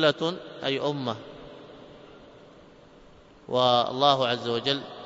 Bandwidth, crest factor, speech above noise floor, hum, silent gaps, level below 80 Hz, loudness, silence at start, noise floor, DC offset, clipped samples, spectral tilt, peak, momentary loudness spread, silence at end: 7.8 kHz; 22 dB; 27 dB; none; none; -64 dBFS; -25 LUFS; 0 s; -52 dBFS; under 0.1%; under 0.1%; -5 dB/octave; -6 dBFS; 24 LU; 0 s